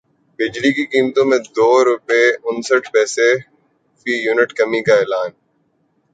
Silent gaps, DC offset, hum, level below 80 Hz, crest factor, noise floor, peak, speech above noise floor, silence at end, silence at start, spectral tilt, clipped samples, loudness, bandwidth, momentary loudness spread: none; under 0.1%; none; -64 dBFS; 16 dB; -63 dBFS; 0 dBFS; 48 dB; 0.85 s; 0.4 s; -3.5 dB/octave; under 0.1%; -16 LUFS; 9.4 kHz; 8 LU